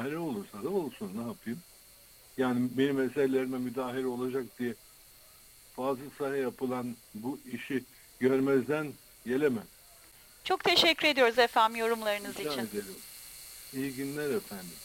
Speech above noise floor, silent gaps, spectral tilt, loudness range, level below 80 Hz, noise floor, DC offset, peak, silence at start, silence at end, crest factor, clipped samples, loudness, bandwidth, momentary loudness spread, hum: 26 dB; none; -4 dB/octave; 9 LU; -66 dBFS; -57 dBFS; under 0.1%; -10 dBFS; 0 s; 0 s; 22 dB; under 0.1%; -31 LUFS; 17 kHz; 18 LU; none